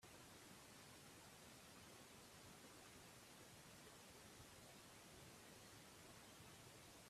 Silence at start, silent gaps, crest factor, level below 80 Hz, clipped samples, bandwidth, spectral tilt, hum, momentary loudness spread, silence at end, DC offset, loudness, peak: 0 s; none; 14 dB; -82 dBFS; under 0.1%; 15.5 kHz; -3 dB/octave; none; 0 LU; 0 s; under 0.1%; -62 LUFS; -50 dBFS